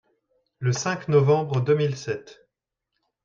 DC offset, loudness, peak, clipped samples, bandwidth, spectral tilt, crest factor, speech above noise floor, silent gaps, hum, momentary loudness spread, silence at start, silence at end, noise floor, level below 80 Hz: under 0.1%; -23 LUFS; -6 dBFS; under 0.1%; 7.6 kHz; -6 dB/octave; 18 dB; 61 dB; none; none; 12 LU; 0.6 s; 0.9 s; -83 dBFS; -64 dBFS